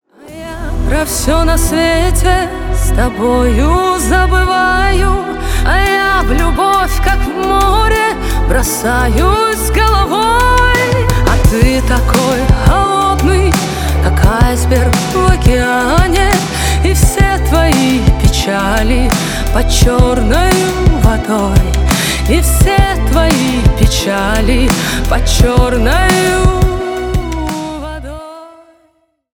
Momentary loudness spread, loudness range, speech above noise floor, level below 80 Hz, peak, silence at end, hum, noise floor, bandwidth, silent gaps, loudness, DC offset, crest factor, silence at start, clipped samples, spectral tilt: 5 LU; 2 LU; 46 dB; -14 dBFS; 0 dBFS; 0.85 s; none; -56 dBFS; 19 kHz; none; -12 LUFS; under 0.1%; 10 dB; 0.25 s; under 0.1%; -5 dB/octave